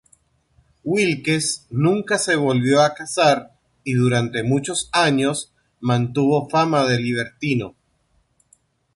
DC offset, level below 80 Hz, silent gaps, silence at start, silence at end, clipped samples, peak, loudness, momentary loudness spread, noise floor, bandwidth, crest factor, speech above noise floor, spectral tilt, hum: under 0.1%; -58 dBFS; none; 0.85 s; 1.25 s; under 0.1%; -4 dBFS; -20 LUFS; 7 LU; -64 dBFS; 11.5 kHz; 16 dB; 45 dB; -5 dB/octave; none